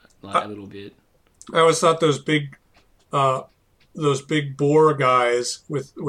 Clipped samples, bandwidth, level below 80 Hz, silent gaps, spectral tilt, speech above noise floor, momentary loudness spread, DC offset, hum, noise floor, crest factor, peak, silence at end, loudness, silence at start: under 0.1%; 12.5 kHz; -64 dBFS; none; -5 dB/octave; 38 dB; 15 LU; under 0.1%; none; -58 dBFS; 18 dB; -4 dBFS; 0 s; -20 LUFS; 0.25 s